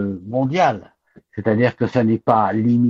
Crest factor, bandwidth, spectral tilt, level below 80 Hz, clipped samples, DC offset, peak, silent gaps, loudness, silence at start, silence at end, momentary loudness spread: 16 dB; 7 kHz; -8 dB/octave; -56 dBFS; under 0.1%; under 0.1%; -2 dBFS; none; -19 LUFS; 0 s; 0 s; 8 LU